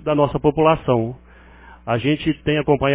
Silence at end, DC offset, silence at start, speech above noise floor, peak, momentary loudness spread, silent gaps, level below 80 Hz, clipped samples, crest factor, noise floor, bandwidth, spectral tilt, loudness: 0 s; under 0.1%; 0 s; 26 dB; -2 dBFS; 8 LU; none; -42 dBFS; under 0.1%; 18 dB; -44 dBFS; 4 kHz; -11 dB/octave; -19 LUFS